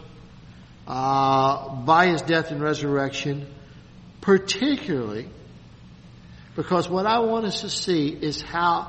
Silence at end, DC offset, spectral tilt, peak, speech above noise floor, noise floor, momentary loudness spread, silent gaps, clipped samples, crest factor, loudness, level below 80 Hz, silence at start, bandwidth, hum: 0 s; under 0.1%; -5 dB/octave; -4 dBFS; 23 dB; -46 dBFS; 13 LU; none; under 0.1%; 20 dB; -23 LUFS; -52 dBFS; 0 s; 8.4 kHz; none